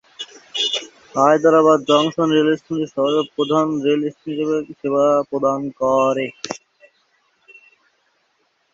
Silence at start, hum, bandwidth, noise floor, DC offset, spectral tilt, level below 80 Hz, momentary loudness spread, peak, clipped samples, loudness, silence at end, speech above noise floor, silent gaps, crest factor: 0.2 s; none; 7.8 kHz; -65 dBFS; under 0.1%; -5 dB/octave; -64 dBFS; 13 LU; 0 dBFS; under 0.1%; -18 LUFS; 2.15 s; 47 dB; none; 18 dB